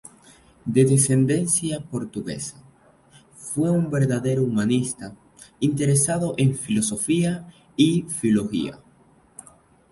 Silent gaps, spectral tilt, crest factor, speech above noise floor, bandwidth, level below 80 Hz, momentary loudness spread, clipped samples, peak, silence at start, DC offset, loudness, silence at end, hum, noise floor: none; -5.5 dB/octave; 18 dB; 35 dB; 12 kHz; -56 dBFS; 14 LU; under 0.1%; -4 dBFS; 0.65 s; under 0.1%; -22 LUFS; 1.15 s; none; -56 dBFS